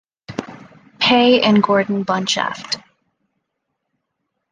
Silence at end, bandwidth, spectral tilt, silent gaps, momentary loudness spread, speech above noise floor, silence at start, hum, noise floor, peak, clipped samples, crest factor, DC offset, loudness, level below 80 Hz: 1.75 s; 9.6 kHz; -4.5 dB/octave; none; 18 LU; 60 dB; 0.3 s; none; -76 dBFS; -2 dBFS; under 0.1%; 18 dB; under 0.1%; -16 LUFS; -60 dBFS